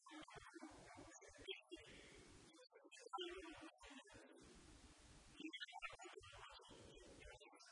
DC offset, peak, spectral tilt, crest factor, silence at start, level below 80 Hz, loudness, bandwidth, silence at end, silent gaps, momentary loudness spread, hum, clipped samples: under 0.1%; -36 dBFS; -3 dB/octave; 24 dB; 0 s; -74 dBFS; -58 LUFS; 10.5 kHz; 0 s; none; 13 LU; none; under 0.1%